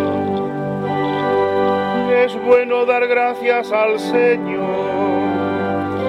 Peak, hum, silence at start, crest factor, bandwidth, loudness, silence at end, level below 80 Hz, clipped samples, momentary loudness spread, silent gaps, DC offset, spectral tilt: -2 dBFS; none; 0 s; 16 dB; 10.5 kHz; -17 LUFS; 0 s; -56 dBFS; under 0.1%; 6 LU; none; under 0.1%; -7 dB/octave